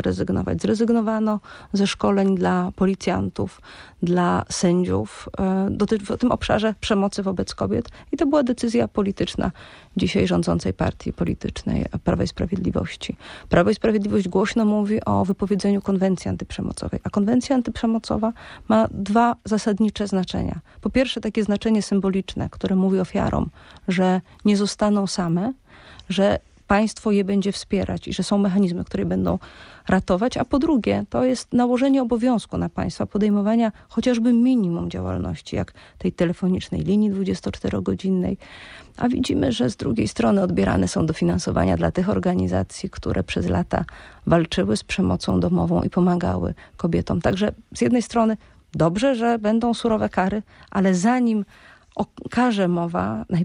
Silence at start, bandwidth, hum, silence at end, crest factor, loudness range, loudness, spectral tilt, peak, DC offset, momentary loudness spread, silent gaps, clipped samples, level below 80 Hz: 0 s; 11 kHz; none; 0 s; 18 dB; 2 LU; -22 LUFS; -6.5 dB/octave; -2 dBFS; under 0.1%; 8 LU; none; under 0.1%; -42 dBFS